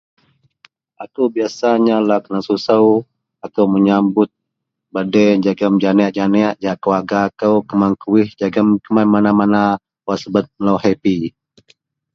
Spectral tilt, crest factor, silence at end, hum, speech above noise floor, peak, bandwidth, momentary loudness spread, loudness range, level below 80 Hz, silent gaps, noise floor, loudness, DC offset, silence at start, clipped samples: -7.5 dB/octave; 16 dB; 0.85 s; none; 63 dB; 0 dBFS; 6.8 kHz; 9 LU; 1 LU; -54 dBFS; none; -77 dBFS; -15 LUFS; under 0.1%; 1 s; under 0.1%